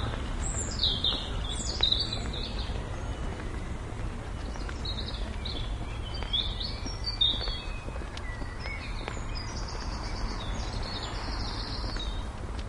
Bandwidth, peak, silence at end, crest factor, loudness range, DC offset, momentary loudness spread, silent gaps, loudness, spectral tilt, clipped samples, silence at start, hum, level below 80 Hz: 11.5 kHz; -12 dBFS; 0 s; 22 dB; 7 LU; under 0.1%; 12 LU; none; -32 LUFS; -3.5 dB/octave; under 0.1%; 0 s; none; -36 dBFS